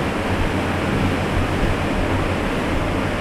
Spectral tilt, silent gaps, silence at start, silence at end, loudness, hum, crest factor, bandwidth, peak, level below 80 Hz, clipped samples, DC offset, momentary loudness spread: -6 dB/octave; none; 0 s; 0 s; -21 LUFS; none; 12 dB; 14.5 kHz; -8 dBFS; -28 dBFS; under 0.1%; under 0.1%; 1 LU